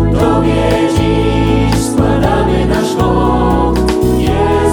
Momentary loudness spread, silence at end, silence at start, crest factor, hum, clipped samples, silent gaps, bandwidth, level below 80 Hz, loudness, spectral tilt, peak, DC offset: 1 LU; 0 s; 0 s; 10 dB; none; under 0.1%; none; 19 kHz; -20 dBFS; -12 LUFS; -6.5 dB/octave; 0 dBFS; under 0.1%